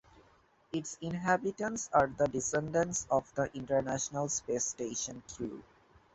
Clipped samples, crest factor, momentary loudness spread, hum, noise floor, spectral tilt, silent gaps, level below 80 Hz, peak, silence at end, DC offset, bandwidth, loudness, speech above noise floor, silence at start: under 0.1%; 22 dB; 10 LU; none; -66 dBFS; -4 dB/octave; none; -62 dBFS; -12 dBFS; 0.5 s; under 0.1%; 8.2 kHz; -34 LUFS; 33 dB; 0.15 s